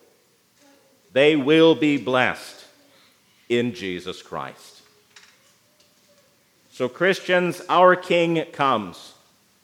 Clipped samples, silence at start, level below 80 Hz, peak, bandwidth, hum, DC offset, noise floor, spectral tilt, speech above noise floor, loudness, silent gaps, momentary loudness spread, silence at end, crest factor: under 0.1%; 1.15 s; -74 dBFS; -2 dBFS; 15 kHz; none; under 0.1%; -61 dBFS; -5.5 dB/octave; 41 dB; -20 LUFS; none; 17 LU; 0.6 s; 20 dB